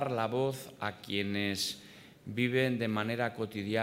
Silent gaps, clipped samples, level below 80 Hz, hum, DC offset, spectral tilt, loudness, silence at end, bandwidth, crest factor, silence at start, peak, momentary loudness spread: none; under 0.1%; -74 dBFS; none; under 0.1%; -5 dB/octave; -33 LUFS; 0 s; 16 kHz; 18 dB; 0 s; -16 dBFS; 11 LU